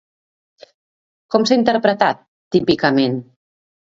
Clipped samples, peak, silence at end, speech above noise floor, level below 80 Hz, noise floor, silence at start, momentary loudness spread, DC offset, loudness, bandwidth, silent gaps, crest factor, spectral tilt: under 0.1%; 0 dBFS; 0.65 s; over 74 dB; -56 dBFS; under -90 dBFS; 1.3 s; 6 LU; under 0.1%; -17 LUFS; 7.8 kHz; 2.28-2.51 s; 18 dB; -5.5 dB/octave